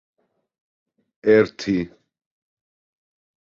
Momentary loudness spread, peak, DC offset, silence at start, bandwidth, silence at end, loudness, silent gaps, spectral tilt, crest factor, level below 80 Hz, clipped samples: 9 LU; -4 dBFS; under 0.1%; 1.25 s; 7.2 kHz; 1.55 s; -20 LUFS; none; -6.5 dB/octave; 22 dB; -58 dBFS; under 0.1%